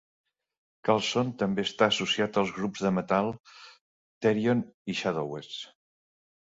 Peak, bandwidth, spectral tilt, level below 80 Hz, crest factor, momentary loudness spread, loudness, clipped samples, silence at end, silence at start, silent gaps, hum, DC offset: -8 dBFS; 8 kHz; -5 dB/octave; -66 dBFS; 22 dB; 12 LU; -28 LUFS; under 0.1%; 0.9 s; 0.85 s; 3.40-3.44 s, 3.81-4.21 s, 4.74-4.85 s; none; under 0.1%